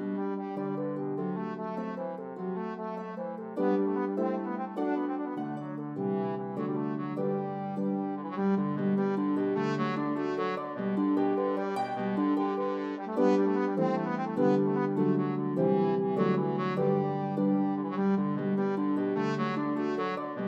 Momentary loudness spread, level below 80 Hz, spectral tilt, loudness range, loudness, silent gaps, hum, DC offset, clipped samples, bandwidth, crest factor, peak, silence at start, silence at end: 8 LU; -84 dBFS; -9 dB/octave; 5 LU; -30 LUFS; none; none; under 0.1%; under 0.1%; 7.2 kHz; 16 dB; -14 dBFS; 0 s; 0 s